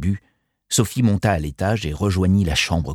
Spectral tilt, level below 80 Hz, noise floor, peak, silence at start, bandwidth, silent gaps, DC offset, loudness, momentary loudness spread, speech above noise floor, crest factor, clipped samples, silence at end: -5 dB/octave; -34 dBFS; -65 dBFS; -4 dBFS; 0 s; 17 kHz; none; under 0.1%; -20 LUFS; 5 LU; 46 dB; 16 dB; under 0.1%; 0 s